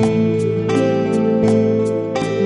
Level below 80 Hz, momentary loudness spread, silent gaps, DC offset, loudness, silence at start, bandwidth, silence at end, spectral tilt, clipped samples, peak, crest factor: -48 dBFS; 5 LU; none; under 0.1%; -17 LUFS; 0 s; 11 kHz; 0 s; -7.5 dB/octave; under 0.1%; -4 dBFS; 12 dB